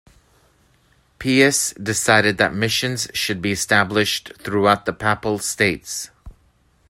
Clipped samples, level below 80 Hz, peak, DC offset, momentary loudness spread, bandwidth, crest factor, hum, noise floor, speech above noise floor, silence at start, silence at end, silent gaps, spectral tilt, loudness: under 0.1%; -50 dBFS; 0 dBFS; under 0.1%; 10 LU; 16 kHz; 20 dB; none; -59 dBFS; 39 dB; 1.2 s; 0.6 s; none; -3 dB/octave; -19 LUFS